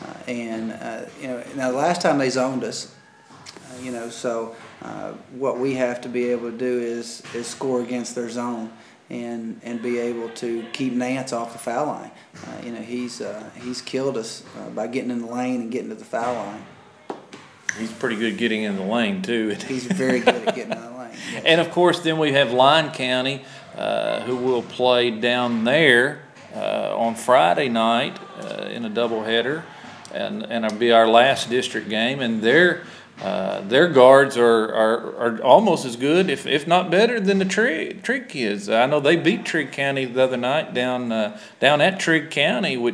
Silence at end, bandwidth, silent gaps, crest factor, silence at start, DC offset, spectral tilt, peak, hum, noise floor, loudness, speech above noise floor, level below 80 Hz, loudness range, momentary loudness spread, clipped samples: 0 s; 11 kHz; none; 20 dB; 0 s; under 0.1%; -4.5 dB/octave; 0 dBFS; none; -47 dBFS; -21 LUFS; 26 dB; -74 dBFS; 11 LU; 17 LU; under 0.1%